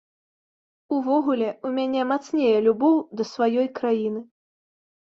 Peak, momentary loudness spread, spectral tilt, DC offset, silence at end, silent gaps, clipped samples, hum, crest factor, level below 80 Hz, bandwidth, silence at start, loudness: -8 dBFS; 8 LU; -6 dB/octave; under 0.1%; 0.8 s; none; under 0.1%; none; 16 dB; -70 dBFS; 7.4 kHz; 0.9 s; -23 LUFS